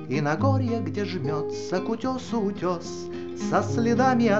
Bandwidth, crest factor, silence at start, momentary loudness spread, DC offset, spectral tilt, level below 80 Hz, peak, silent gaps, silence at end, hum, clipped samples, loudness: 7.8 kHz; 16 dB; 0 s; 10 LU; 0.5%; -6.5 dB/octave; -66 dBFS; -8 dBFS; none; 0 s; none; under 0.1%; -26 LUFS